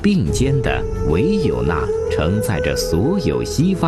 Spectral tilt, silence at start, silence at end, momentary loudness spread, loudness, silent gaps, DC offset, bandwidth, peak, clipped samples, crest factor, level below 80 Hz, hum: -6 dB/octave; 0 s; 0 s; 3 LU; -18 LUFS; none; under 0.1%; 14 kHz; -4 dBFS; under 0.1%; 12 dB; -28 dBFS; none